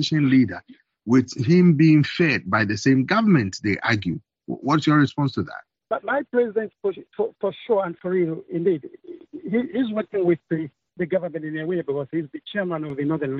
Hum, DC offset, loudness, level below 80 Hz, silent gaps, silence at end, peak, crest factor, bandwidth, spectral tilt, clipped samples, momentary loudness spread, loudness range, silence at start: none; under 0.1%; -22 LUFS; -62 dBFS; none; 0 s; -6 dBFS; 16 dB; 7.8 kHz; -6 dB/octave; under 0.1%; 12 LU; 7 LU; 0 s